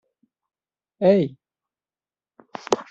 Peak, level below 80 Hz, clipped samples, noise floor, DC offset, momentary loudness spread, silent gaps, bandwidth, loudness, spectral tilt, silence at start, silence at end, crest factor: -2 dBFS; -68 dBFS; under 0.1%; under -90 dBFS; under 0.1%; 21 LU; none; 8 kHz; -21 LUFS; -6 dB/octave; 1 s; 0.05 s; 24 dB